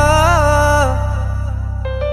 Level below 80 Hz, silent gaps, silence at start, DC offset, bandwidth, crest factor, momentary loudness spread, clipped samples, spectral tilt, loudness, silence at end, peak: -20 dBFS; none; 0 s; under 0.1%; 13 kHz; 14 dB; 10 LU; under 0.1%; -5 dB/octave; -15 LUFS; 0 s; 0 dBFS